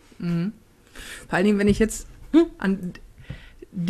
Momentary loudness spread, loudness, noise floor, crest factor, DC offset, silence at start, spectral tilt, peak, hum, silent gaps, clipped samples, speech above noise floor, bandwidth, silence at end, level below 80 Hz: 22 LU; -23 LUFS; -43 dBFS; 20 dB; under 0.1%; 0.2 s; -6 dB/octave; -4 dBFS; none; none; under 0.1%; 22 dB; 13.5 kHz; 0 s; -42 dBFS